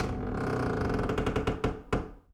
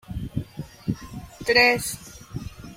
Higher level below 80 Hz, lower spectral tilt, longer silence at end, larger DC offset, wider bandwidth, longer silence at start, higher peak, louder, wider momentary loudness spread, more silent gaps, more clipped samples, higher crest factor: about the same, -40 dBFS vs -44 dBFS; first, -7 dB/octave vs -3.5 dB/octave; first, 0.15 s vs 0 s; neither; second, 14.5 kHz vs 16.5 kHz; about the same, 0 s vs 0.1 s; second, -16 dBFS vs -2 dBFS; second, -32 LUFS vs -23 LUFS; second, 4 LU vs 21 LU; neither; neither; second, 14 dB vs 24 dB